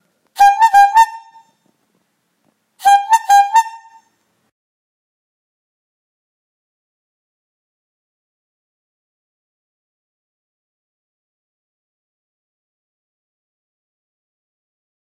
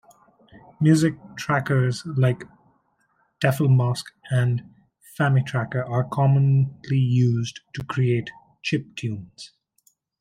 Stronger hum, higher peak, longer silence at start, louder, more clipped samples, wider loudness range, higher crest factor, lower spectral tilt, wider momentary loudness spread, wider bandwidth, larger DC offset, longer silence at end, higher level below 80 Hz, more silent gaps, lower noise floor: neither; first, 0 dBFS vs -4 dBFS; second, 0.4 s vs 0.55 s; first, -11 LUFS vs -23 LUFS; neither; about the same, 5 LU vs 3 LU; about the same, 18 dB vs 18 dB; second, 2.5 dB/octave vs -7 dB/octave; second, 8 LU vs 13 LU; first, 16 kHz vs 14 kHz; neither; first, 11.25 s vs 0.75 s; about the same, -64 dBFS vs -60 dBFS; neither; about the same, -65 dBFS vs -67 dBFS